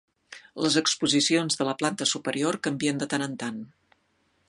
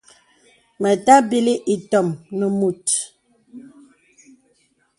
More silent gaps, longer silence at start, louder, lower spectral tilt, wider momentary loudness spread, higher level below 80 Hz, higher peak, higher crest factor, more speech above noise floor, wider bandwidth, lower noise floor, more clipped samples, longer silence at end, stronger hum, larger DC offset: neither; second, 0.3 s vs 0.8 s; second, -25 LUFS vs -18 LUFS; second, -3 dB/octave vs -4.5 dB/octave; about the same, 12 LU vs 11 LU; second, -72 dBFS vs -66 dBFS; second, -8 dBFS vs 0 dBFS; about the same, 20 dB vs 20 dB; about the same, 43 dB vs 45 dB; about the same, 11.5 kHz vs 11.5 kHz; first, -70 dBFS vs -63 dBFS; neither; second, 0.8 s vs 1.4 s; neither; neither